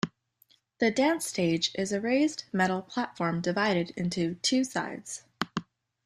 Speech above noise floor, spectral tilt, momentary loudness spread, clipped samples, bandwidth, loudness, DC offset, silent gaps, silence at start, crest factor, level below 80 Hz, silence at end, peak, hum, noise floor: 38 dB; -4.5 dB/octave; 9 LU; under 0.1%; 14 kHz; -29 LUFS; under 0.1%; none; 0.05 s; 20 dB; -68 dBFS; 0.45 s; -10 dBFS; none; -66 dBFS